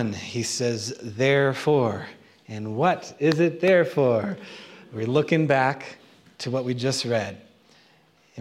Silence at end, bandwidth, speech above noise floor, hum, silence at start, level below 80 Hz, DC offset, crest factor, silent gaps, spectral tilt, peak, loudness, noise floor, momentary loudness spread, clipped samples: 0 s; 14.5 kHz; 36 dB; none; 0 s; -70 dBFS; under 0.1%; 18 dB; none; -5.5 dB/octave; -6 dBFS; -23 LUFS; -59 dBFS; 16 LU; under 0.1%